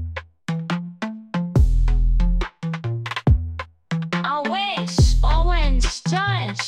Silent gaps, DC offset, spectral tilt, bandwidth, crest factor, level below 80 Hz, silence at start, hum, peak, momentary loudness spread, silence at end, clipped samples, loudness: none; under 0.1%; -5.5 dB/octave; 9.8 kHz; 14 dB; -22 dBFS; 0 s; none; -6 dBFS; 10 LU; 0 s; under 0.1%; -22 LUFS